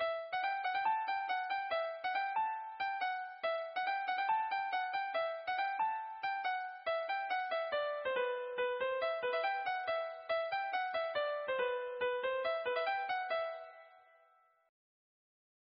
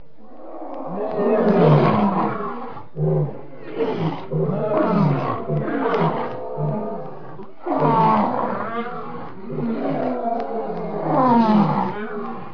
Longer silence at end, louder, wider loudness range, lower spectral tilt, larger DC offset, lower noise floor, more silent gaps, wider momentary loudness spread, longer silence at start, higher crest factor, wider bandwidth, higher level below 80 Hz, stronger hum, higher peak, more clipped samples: first, 1.65 s vs 0 s; second, -37 LUFS vs -21 LUFS; about the same, 1 LU vs 3 LU; second, 2.5 dB/octave vs -10 dB/octave; second, under 0.1% vs 2%; first, -70 dBFS vs -43 dBFS; neither; second, 4 LU vs 17 LU; second, 0 s vs 0.25 s; about the same, 14 dB vs 18 dB; about the same, 5.8 kHz vs 5.4 kHz; second, -84 dBFS vs -58 dBFS; neither; second, -24 dBFS vs -2 dBFS; neither